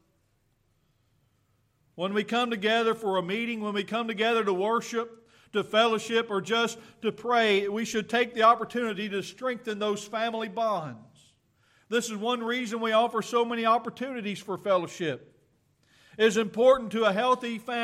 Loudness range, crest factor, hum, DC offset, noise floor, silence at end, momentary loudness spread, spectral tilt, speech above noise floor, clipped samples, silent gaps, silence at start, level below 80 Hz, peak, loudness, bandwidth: 5 LU; 20 dB; none; under 0.1%; -70 dBFS; 0 s; 10 LU; -4 dB/octave; 43 dB; under 0.1%; none; 1.95 s; -72 dBFS; -8 dBFS; -27 LUFS; 14.5 kHz